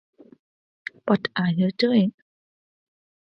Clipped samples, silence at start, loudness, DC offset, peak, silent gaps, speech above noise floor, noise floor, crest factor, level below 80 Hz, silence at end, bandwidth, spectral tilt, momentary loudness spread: under 0.1%; 1.05 s; -23 LUFS; under 0.1%; -6 dBFS; none; over 69 dB; under -90 dBFS; 20 dB; -70 dBFS; 1.25 s; 6 kHz; -8 dB/octave; 16 LU